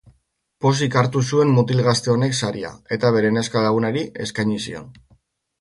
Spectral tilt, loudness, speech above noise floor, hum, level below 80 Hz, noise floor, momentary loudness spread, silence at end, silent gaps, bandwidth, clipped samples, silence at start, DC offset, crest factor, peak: -5.5 dB/octave; -20 LUFS; 43 dB; none; -56 dBFS; -62 dBFS; 10 LU; 0.7 s; none; 11.5 kHz; under 0.1%; 0.6 s; under 0.1%; 18 dB; -2 dBFS